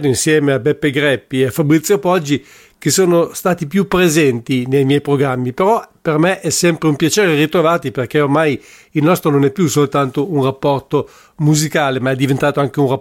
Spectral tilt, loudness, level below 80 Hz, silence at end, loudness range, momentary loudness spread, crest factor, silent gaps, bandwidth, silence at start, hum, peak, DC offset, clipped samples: -5 dB/octave; -15 LUFS; -48 dBFS; 0 s; 1 LU; 5 LU; 12 dB; none; 17 kHz; 0 s; none; -2 dBFS; under 0.1%; under 0.1%